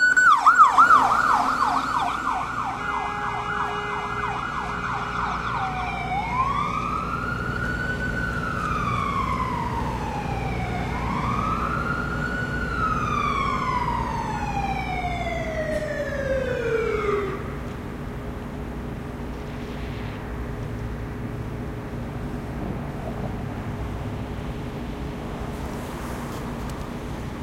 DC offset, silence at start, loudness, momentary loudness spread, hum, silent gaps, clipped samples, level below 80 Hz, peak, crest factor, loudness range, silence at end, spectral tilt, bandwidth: under 0.1%; 0 s; -25 LUFS; 12 LU; none; none; under 0.1%; -36 dBFS; -4 dBFS; 22 dB; 8 LU; 0 s; -5.5 dB/octave; 16 kHz